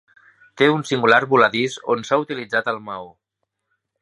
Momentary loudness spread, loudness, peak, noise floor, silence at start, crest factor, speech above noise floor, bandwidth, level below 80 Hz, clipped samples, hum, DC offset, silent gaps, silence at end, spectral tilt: 12 LU; -19 LUFS; 0 dBFS; -78 dBFS; 0.55 s; 20 dB; 59 dB; 11.5 kHz; -68 dBFS; under 0.1%; none; under 0.1%; none; 0.95 s; -5 dB/octave